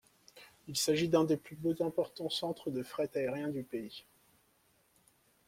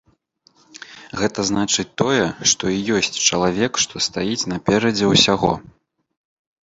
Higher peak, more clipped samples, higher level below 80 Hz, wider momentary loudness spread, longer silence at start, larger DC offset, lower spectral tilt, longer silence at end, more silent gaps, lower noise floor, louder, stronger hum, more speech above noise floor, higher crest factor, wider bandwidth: second, -16 dBFS vs 0 dBFS; neither; second, -72 dBFS vs -48 dBFS; first, 15 LU vs 9 LU; second, 0.35 s vs 0.75 s; neither; first, -4.5 dB/octave vs -3 dB/octave; first, 1.5 s vs 1.05 s; neither; first, -71 dBFS vs -59 dBFS; second, -35 LUFS vs -18 LUFS; neither; about the same, 37 dB vs 40 dB; about the same, 20 dB vs 20 dB; first, 16.5 kHz vs 8 kHz